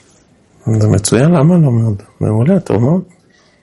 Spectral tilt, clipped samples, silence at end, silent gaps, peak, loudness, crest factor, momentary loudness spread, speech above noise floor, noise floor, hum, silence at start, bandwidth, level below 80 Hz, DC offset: -7 dB/octave; under 0.1%; 0.6 s; none; 0 dBFS; -12 LUFS; 12 dB; 9 LU; 38 dB; -49 dBFS; none; 0.65 s; 11.5 kHz; -46 dBFS; under 0.1%